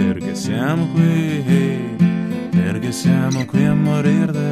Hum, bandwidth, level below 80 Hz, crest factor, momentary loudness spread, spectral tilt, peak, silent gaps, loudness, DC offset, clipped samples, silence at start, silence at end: none; 13.5 kHz; -50 dBFS; 14 dB; 5 LU; -7 dB/octave; -2 dBFS; none; -17 LUFS; under 0.1%; under 0.1%; 0 s; 0 s